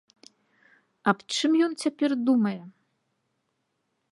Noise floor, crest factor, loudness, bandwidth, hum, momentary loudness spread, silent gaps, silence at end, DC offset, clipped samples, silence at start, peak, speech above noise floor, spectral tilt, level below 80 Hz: -77 dBFS; 22 dB; -25 LUFS; 11.5 kHz; none; 6 LU; none; 1.45 s; under 0.1%; under 0.1%; 1.05 s; -6 dBFS; 52 dB; -4.5 dB/octave; -80 dBFS